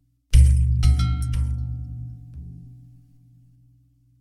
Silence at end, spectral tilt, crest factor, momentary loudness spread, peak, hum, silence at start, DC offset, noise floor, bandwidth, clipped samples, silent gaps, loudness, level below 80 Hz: 1.5 s; -6 dB/octave; 18 dB; 23 LU; -4 dBFS; 60 Hz at -35 dBFS; 0.3 s; under 0.1%; -58 dBFS; 12 kHz; under 0.1%; none; -21 LUFS; -24 dBFS